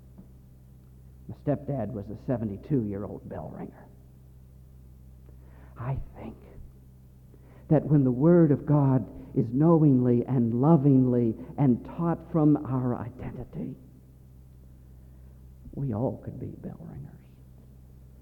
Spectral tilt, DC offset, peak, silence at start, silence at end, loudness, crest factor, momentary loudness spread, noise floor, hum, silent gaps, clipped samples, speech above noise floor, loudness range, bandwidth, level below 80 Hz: -12 dB/octave; under 0.1%; -10 dBFS; 0.2 s; 1.05 s; -26 LUFS; 18 dB; 21 LU; -51 dBFS; none; none; under 0.1%; 26 dB; 19 LU; 3.1 kHz; -50 dBFS